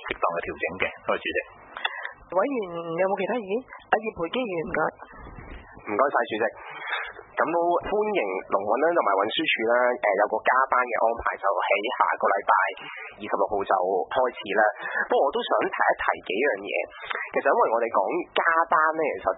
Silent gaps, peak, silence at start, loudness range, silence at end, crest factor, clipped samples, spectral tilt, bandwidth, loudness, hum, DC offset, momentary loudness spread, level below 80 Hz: none; -4 dBFS; 0 s; 5 LU; 0 s; 20 dB; under 0.1%; -8.5 dB/octave; 4 kHz; -25 LUFS; none; under 0.1%; 10 LU; -56 dBFS